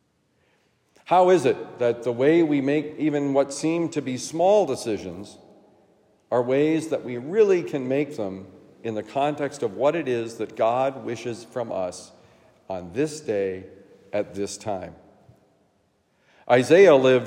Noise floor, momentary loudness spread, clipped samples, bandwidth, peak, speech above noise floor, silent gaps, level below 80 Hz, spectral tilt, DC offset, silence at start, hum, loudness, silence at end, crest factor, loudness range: -67 dBFS; 14 LU; under 0.1%; 13.5 kHz; -4 dBFS; 45 dB; none; -74 dBFS; -5.5 dB/octave; under 0.1%; 1.1 s; none; -23 LUFS; 0 s; 20 dB; 9 LU